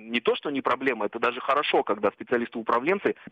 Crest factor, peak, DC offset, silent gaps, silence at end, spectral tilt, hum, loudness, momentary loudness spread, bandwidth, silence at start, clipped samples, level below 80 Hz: 16 dB; -10 dBFS; under 0.1%; none; 0 s; -6 dB/octave; none; -26 LUFS; 4 LU; 8 kHz; 0 s; under 0.1%; -70 dBFS